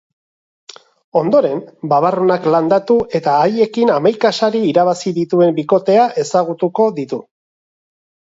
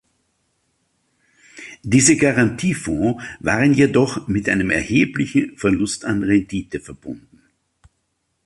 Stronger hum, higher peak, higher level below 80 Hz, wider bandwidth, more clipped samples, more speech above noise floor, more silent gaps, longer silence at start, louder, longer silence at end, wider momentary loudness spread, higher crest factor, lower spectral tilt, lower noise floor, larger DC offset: neither; about the same, 0 dBFS vs -2 dBFS; second, -58 dBFS vs -46 dBFS; second, 8 kHz vs 11.5 kHz; neither; first, over 76 dB vs 53 dB; neither; second, 1.15 s vs 1.55 s; first, -15 LUFS vs -18 LUFS; second, 1.1 s vs 1.25 s; second, 6 LU vs 19 LU; about the same, 14 dB vs 18 dB; about the same, -6 dB/octave vs -5 dB/octave; first, under -90 dBFS vs -71 dBFS; neither